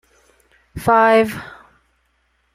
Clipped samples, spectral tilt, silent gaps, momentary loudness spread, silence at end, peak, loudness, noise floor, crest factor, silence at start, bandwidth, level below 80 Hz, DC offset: under 0.1%; -5.5 dB/octave; none; 25 LU; 1.05 s; -2 dBFS; -15 LUFS; -64 dBFS; 18 dB; 0.75 s; 15.5 kHz; -50 dBFS; under 0.1%